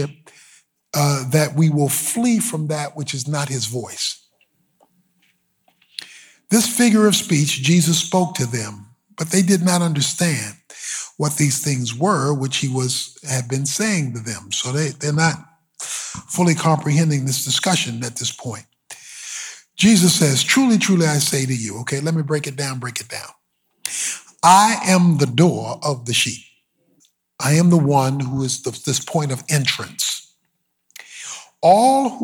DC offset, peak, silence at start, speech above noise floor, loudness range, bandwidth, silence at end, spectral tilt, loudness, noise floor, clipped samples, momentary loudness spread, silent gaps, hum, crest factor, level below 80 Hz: under 0.1%; -2 dBFS; 0 s; 53 dB; 6 LU; 20 kHz; 0 s; -4 dB/octave; -18 LUFS; -71 dBFS; under 0.1%; 16 LU; none; none; 18 dB; -62 dBFS